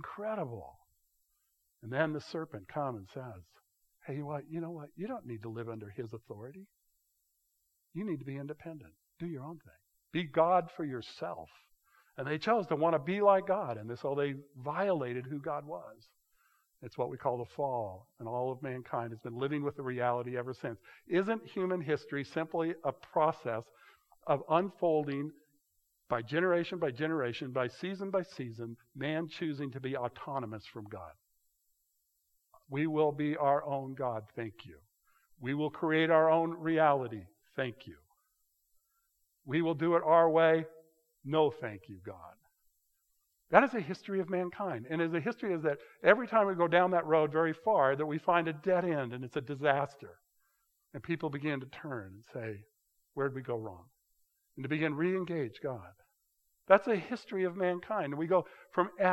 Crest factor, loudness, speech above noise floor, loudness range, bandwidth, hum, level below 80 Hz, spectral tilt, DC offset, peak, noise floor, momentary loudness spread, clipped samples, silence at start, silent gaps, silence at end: 28 dB; -33 LUFS; 46 dB; 11 LU; 13 kHz; none; -78 dBFS; -7.5 dB/octave; under 0.1%; -6 dBFS; -79 dBFS; 19 LU; under 0.1%; 0 s; none; 0 s